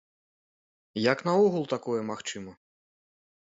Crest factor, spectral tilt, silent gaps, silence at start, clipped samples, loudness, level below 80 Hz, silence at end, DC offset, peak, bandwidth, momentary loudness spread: 22 dB; -5.5 dB/octave; none; 0.95 s; under 0.1%; -28 LUFS; -72 dBFS; 0.9 s; under 0.1%; -8 dBFS; 8 kHz; 16 LU